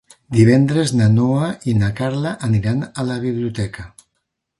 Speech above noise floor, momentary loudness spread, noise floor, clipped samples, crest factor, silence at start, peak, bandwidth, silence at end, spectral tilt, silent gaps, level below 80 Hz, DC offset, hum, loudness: 58 dB; 10 LU; -74 dBFS; under 0.1%; 16 dB; 0.3 s; 0 dBFS; 11.5 kHz; 0.7 s; -7 dB/octave; none; -44 dBFS; under 0.1%; none; -18 LUFS